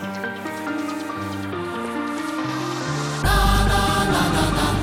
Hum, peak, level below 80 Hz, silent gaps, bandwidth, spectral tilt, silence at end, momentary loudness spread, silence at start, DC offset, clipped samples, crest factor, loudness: none; -6 dBFS; -28 dBFS; none; 16.5 kHz; -4.5 dB/octave; 0 s; 10 LU; 0 s; under 0.1%; under 0.1%; 16 dB; -22 LUFS